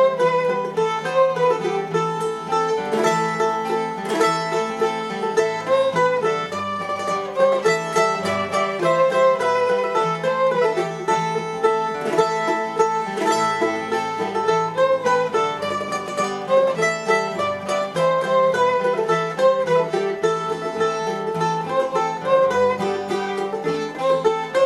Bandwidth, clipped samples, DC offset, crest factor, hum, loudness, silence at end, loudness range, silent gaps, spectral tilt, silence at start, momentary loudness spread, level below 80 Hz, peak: 13 kHz; under 0.1%; under 0.1%; 16 dB; none; -20 LUFS; 0 s; 2 LU; none; -4.5 dB/octave; 0 s; 6 LU; -66 dBFS; -6 dBFS